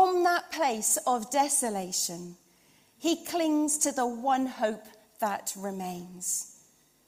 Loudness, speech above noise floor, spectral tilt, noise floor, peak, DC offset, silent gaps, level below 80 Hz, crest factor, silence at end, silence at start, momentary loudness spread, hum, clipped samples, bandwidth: -28 LUFS; 33 dB; -2.5 dB/octave; -63 dBFS; -12 dBFS; under 0.1%; none; -74 dBFS; 18 dB; 0.55 s; 0 s; 11 LU; none; under 0.1%; 16 kHz